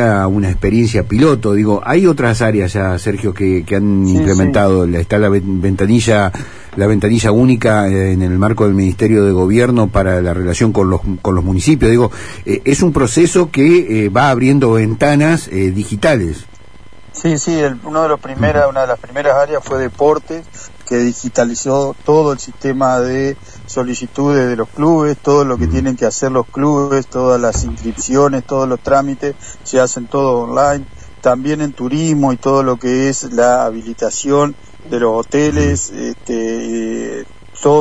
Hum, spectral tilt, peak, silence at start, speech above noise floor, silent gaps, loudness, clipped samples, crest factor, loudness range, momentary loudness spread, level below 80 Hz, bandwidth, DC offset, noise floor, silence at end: none; -6 dB/octave; 0 dBFS; 0 s; 28 dB; none; -14 LUFS; under 0.1%; 14 dB; 4 LU; 9 LU; -32 dBFS; 11 kHz; 2%; -40 dBFS; 0 s